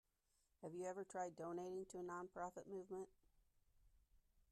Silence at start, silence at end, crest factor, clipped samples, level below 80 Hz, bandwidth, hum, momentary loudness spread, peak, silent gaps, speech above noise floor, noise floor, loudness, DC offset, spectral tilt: 0.6 s; 0.35 s; 18 dB; under 0.1%; -80 dBFS; 13 kHz; none; 6 LU; -36 dBFS; none; 34 dB; -85 dBFS; -52 LUFS; under 0.1%; -6 dB/octave